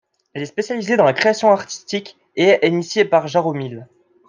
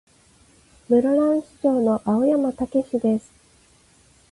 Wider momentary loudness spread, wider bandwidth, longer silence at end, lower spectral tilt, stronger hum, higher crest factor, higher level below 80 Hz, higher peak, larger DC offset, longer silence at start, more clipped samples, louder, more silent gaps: first, 16 LU vs 5 LU; second, 9.8 kHz vs 11.5 kHz; second, 0.45 s vs 1.1 s; second, -5 dB/octave vs -8 dB/octave; neither; about the same, 16 dB vs 16 dB; second, -68 dBFS vs -58 dBFS; first, -2 dBFS vs -8 dBFS; neither; second, 0.35 s vs 0.9 s; neither; first, -17 LUFS vs -21 LUFS; neither